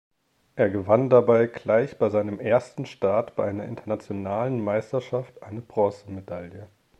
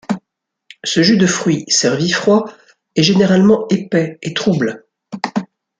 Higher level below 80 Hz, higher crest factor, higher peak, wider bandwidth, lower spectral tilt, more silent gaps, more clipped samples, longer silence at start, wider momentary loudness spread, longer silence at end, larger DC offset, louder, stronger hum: second, -64 dBFS vs -56 dBFS; about the same, 20 dB vs 16 dB; second, -4 dBFS vs 0 dBFS; about the same, 8.8 kHz vs 9.4 kHz; first, -8 dB/octave vs -4.5 dB/octave; neither; neither; first, 0.55 s vs 0.1 s; first, 18 LU vs 14 LU; about the same, 0.35 s vs 0.35 s; neither; second, -24 LUFS vs -15 LUFS; neither